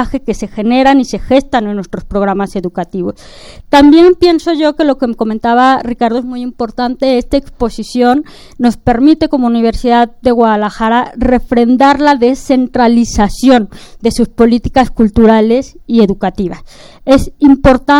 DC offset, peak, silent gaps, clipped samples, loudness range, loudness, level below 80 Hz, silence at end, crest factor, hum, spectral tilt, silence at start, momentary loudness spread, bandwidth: under 0.1%; 0 dBFS; none; 0.6%; 3 LU; -11 LUFS; -28 dBFS; 0 s; 10 dB; none; -6 dB/octave; 0 s; 11 LU; 12.5 kHz